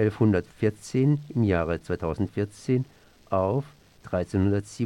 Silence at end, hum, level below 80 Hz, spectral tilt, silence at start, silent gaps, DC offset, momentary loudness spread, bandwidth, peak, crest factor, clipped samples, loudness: 0 s; none; -50 dBFS; -8 dB/octave; 0 s; none; under 0.1%; 7 LU; 11.5 kHz; -10 dBFS; 16 dB; under 0.1%; -26 LUFS